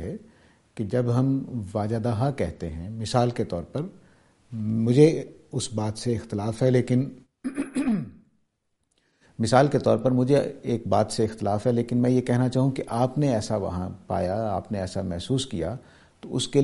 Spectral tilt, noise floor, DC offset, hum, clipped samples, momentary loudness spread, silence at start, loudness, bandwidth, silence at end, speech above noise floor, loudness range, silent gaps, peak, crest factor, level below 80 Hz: -7 dB/octave; -74 dBFS; under 0.1%; none; under 0.1%; 13 LU; 0 s; -25 LUFS; 11.5 kHz; 0 s; 50 dB; 5 LU; none; -4 dBFS; 22 dB; -52 dBFS